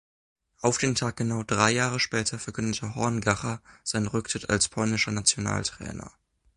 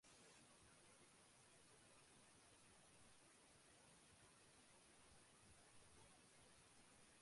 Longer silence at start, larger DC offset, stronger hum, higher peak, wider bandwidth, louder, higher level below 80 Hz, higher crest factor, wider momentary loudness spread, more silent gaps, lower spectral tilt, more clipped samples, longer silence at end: first, 0.6 s vs 0 s; neither; neither; first, -4 dBFS vs -56 dBFS; about the same, 11.5 kHz vs 11.5 kHz; first, -26 LUFS vs -69 LUFS; first, -52 dBFS vs -86 dBFS; first, 24 dB vs 14 dB; first, 9 LU vs 1 LU; neither; about the same, -3.5 dB/octave vs -2.5 dB/octave; neither; first, 0.5 s vs 0 s